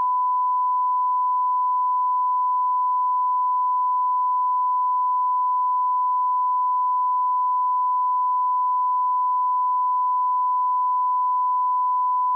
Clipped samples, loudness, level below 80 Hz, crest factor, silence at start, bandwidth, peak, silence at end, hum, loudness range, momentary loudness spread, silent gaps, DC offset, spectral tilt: under 0.1%; -21 LUFS; under -90 dBFS; 4 dB; 0 s; 1.1 kHz; -18 dBFS; 0 s; none; 0 LU; 0 LU; none; under 0.1%; 25 dB/octave